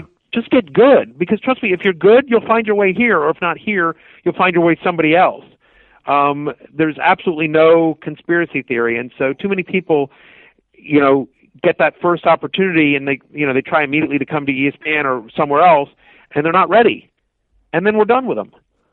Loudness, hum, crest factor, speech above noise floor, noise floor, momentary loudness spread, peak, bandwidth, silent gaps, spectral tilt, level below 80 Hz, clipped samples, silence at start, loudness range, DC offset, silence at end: -15 LUFS; none; 14 dB; 47 dB; -62 dBFS; 11 LU; 0 dBFS; 4.3 kHz; none; -9.5 dB/octave; -58 dBFS; under 0.1%; 0 s; 3 LU; under 0.1%; 0.5 s